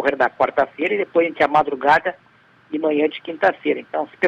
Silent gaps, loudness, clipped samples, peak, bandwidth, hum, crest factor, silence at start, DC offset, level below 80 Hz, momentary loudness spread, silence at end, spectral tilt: none; -19 LUFS; under 0.1%; -6 dBFS; 9.2 kHz; none; 14 dB; 0 s; under 0.1%; -60 dBFS; 7 LU; 0 s; -6 dB/octave